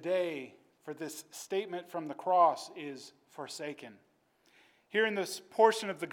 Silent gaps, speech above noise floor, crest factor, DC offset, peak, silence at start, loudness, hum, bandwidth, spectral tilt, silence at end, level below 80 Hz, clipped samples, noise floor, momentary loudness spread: none; 36 dB; 22 dB; under 0.1%; -12 dBFS; 0 s; -33 LUFS; none; 17.5 kHz; -3.5 dB/octave; 0 s; under -90 dBFS; under 0.1%; -69 dBFS; 22 LU